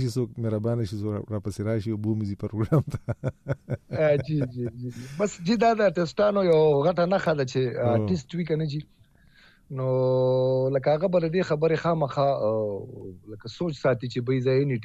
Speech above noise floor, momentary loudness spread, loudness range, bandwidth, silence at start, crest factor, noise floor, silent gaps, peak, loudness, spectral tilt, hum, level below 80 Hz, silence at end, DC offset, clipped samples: 32 dB; 11 LU; 5 LU; 12.5 kHz; 0 s; 16 dB; -56 dBFS; none; -10 dBFS; -25 LUFS; -7.5 dB/octave; none; -54 dBFS; 0 s; under 0.1%; under 0.1%